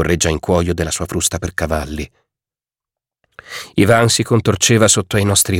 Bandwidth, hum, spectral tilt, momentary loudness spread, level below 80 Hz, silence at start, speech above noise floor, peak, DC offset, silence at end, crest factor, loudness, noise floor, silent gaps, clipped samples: 17 kHz; none; -4 dB/octave; 15 LU; -34 dBFS; 0 s; over 75 dB; 0 dBFS; under 0.1%; 0 s; 16 dB; -15 LUFS; under -90 dBFS; none; under 0.1%